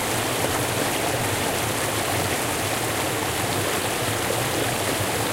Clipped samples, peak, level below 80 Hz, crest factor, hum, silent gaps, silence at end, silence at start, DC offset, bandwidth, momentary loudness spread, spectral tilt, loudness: under 0.1%; -8 dBFS; -46 dBFS; 16 dB; none; none; 0 s; 0 s; under 0.1%; 16 kHz; 1 LU; -3 dB/octave; -23 LUFS